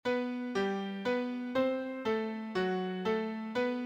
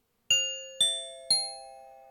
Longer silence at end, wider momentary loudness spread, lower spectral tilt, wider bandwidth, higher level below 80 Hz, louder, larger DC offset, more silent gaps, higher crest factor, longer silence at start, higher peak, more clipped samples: about the same, 0 s vs 0.05 s; second, 3 LU vs 10 LU; first, -6.5 dB/octave vs 2.5 dB/octave; second, 9 kHz vs 19 kHz; about the same, -72 dBFS vs -74 dBFS; second, -34 LUFS vs -27 LUFS; neither; neither; about the same, 16 dB vs 18 dB; second, 0.05 s vs 0.3 s; second, -18 dBFS vs -14 dBFS; neither